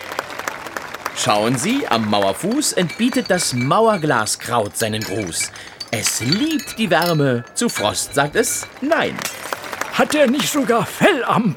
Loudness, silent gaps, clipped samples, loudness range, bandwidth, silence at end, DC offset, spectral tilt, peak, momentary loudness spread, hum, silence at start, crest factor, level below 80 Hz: -18 LUFS; none; under 0.1%; 2 LU; over 20 kHz; 0 s; under 0.1%; -3.5 dB/octave; -2 dBFS; 10 LU; none; 0 s; 18 dB; -54 dBFS